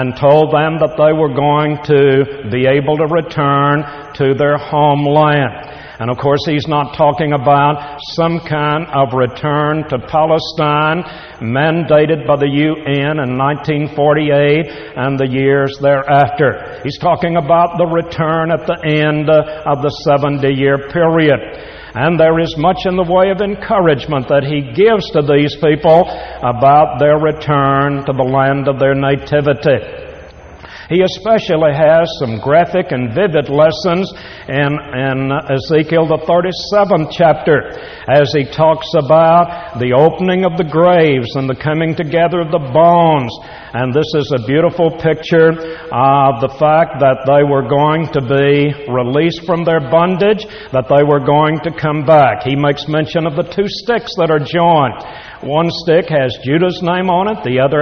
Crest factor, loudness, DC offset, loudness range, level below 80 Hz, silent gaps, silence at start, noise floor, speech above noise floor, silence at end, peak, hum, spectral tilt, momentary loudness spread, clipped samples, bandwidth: 12 dB; -13 LUFS; under 0.1%; 3 LU; -42 dBFS; none; 0 s; -34 dBFS; 22 dB; 0 s; 0 dBFS; none; -5 dB/octave; 7 LU; under 0.1%; 6.6 kHz